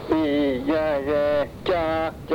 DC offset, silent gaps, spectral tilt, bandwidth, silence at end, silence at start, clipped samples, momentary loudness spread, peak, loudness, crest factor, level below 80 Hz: under 0.1%; none; -7 dB/octave; 18 kHz; 0 s; 0 s; under 0.1%; 3 LU; -8 dBFS; -23 LUFS; 14 dB; -44 dBFS